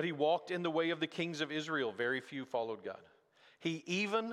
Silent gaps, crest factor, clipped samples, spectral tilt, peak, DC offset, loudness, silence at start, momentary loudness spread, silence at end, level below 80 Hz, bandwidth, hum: none; 16 dB; under 0.1%; -5 dB/octave; -20 dBFS; under 0.1%; -37 LUFS; 0 s; 8 LU; 0 s; -84 dBFS; 12 kHz; none